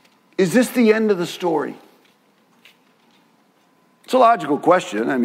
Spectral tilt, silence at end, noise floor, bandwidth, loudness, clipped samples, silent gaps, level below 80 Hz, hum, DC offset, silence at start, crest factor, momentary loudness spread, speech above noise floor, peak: -5.5 dB/octave; 0 s; -58 dBFS; 16 kHz; -18 LUFS; under 0.1%; none; -76 dBFS; none; under 0.1%; 0.4 s; 18 dB; 8 LU; 41 dB; -2 dBFS